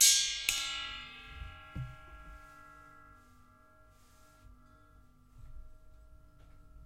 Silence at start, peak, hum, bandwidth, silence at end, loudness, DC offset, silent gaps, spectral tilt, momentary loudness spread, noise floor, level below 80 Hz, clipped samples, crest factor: 0 s; -10 dBFS; none; 16 kHz; 0.05 s; -32 LUFS; under 0.1%; none; 1 dB/octave; 27 LU; -62 dBFS; -56 dBFS; under 0.1%; 28 dB